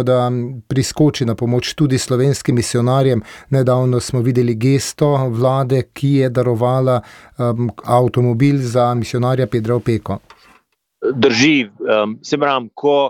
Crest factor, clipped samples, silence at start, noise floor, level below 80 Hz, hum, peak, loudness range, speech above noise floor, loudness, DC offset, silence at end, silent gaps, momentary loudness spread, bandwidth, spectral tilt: 14 dB; under 0.1%; 0 s; -56 dBFS; -48 dBFS; none; -2 dBFS; 1 LU; 41 dB; -16 LUFS; under 0.1%; 0 s; none; 6 LU; 15 kHz; -6 dB/octave